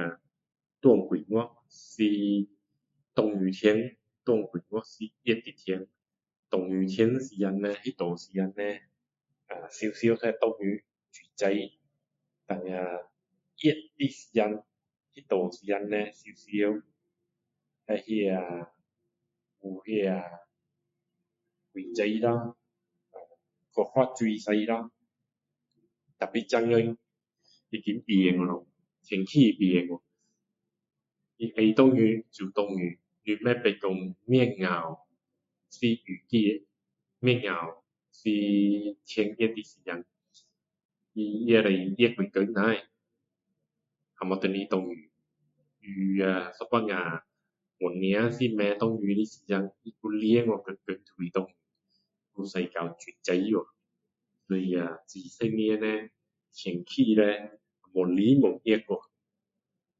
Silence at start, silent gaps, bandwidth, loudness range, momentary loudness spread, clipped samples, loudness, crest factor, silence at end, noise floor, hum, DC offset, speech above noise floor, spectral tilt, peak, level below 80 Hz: 0 s; 6.39-6.43 s, 40.85-40.89 s; 7.8 kHz; 7 LU; 15 LU; under 0.1%; -28 LUFS; 22 dB; 1 s; -86 dBFS; none; under 0.1%; 59 dB; -7 dB/octave; -8 dBFS; -74 dBFS